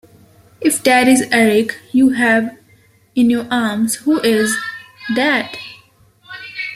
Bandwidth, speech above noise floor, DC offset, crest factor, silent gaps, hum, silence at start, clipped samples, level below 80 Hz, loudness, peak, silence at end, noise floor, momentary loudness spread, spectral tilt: 15.5 kHz; 37 dB; under 0.1%; 16 dB; none; none; 0.6 s; under 0.1%; -58 dBFS; -15 LUFS; 0 dBFS; 0 s; -51 dBFS; 17 LU; -3.5 dB/octave